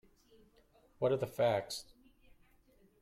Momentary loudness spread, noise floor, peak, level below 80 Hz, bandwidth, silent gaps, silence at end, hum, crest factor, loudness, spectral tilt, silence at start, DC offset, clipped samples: 11 LU; -68 dBFS; -20 dBFS; -70 dBFS; 16 kHz; none; 1.2 s; none; 18 dB; -35 LUFS; -5 dB/octave; 1 s; under 0.1%; under 0.1%